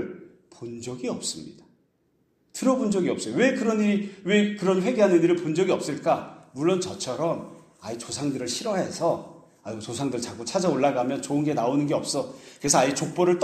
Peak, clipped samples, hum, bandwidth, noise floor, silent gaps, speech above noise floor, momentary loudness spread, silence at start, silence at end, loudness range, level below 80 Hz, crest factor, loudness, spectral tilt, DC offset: -6 dBFS; under 0.1%; none; 13.5 kHz; -68 dBFS; none; 44 dB; 16 LU; 0 s; 0 s; 7 LU; -64 dBFS; 18 dB; -25 LUFS; -4.5 dB/octave; under 0.1%